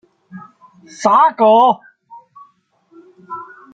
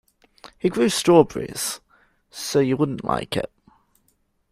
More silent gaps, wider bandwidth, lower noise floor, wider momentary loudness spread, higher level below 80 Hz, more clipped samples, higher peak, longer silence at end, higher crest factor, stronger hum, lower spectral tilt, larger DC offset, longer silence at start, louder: neither; second, 9 kHz vs 15.5 kHz; second, -55 dBFS vs -67 dBFS; first, 21 LU vs 17 LU; second, -72 dBFS vs -54 dBFS; neither; about the same, -2 dBFS vs -2 dBFS; second, 0.3 s vs 1.05 s; second, 16 dB vs 22 dB; neither; about the same, -4.5 dB/octave vs -5 dB/octave; neither; about the same, 0.35 s vs 0.45 s; first, -12 LUFS vs -21 LUFS